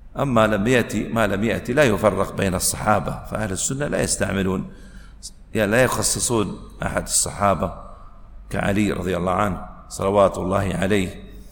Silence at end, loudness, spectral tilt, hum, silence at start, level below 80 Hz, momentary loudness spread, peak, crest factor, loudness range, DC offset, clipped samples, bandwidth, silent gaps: 0 s; -21 LUFS; -4.5 dB/octave; none; 0 s; -38 dBFS; 12 LU; -2 dBFS; 20 dB; 3 LU; under 0.1%; under 0.1%; 19 kHz; none